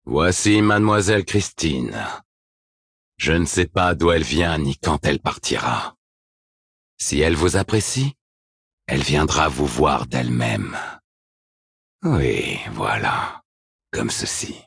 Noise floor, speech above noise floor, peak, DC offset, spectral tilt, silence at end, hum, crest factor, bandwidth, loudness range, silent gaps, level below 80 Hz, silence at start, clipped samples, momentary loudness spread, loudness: under -90 dBFS; over 70 dB; -2 dBFS; under 0.1%; -4.5 dB/octave; 0.05 s; none; 18 dB; 10.5 kHz; 4 LU; 2.25-3.12 s, 5.98-6.97 s, 8.21-8.78 s, 11.04-11.99 s, 13.45-13.79 s; -38 dBFS; 0.05 s; under 0.1%; 10 LU; -20 LUFS